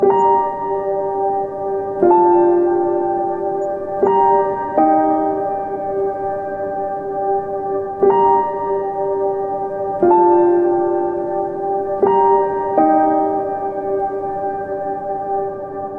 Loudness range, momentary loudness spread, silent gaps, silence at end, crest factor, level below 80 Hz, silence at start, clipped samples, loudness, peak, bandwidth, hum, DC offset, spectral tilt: 3 LU; 10 LU; none; 0 s; 16 dB; -52 dBFS; 0 s; under 0.1%; -17 LUFS; -2 dBFS; 3 kHz; none; 0.1%; -9.5 dB/octave